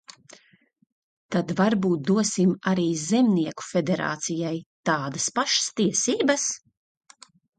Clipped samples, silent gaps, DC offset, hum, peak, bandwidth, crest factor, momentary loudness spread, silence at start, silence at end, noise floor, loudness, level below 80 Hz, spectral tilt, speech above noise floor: under 0.1%; 0.92-1.29 s, 4.66-4.83 s; under 0.1%; none; -8 dBFS; 9.4 kHz; 18 dB; 7 LU; 0.1 s; 1 s; -62 dBFS; -24 LUFS; -68 dBFS; -4 dB/octave; 38 dB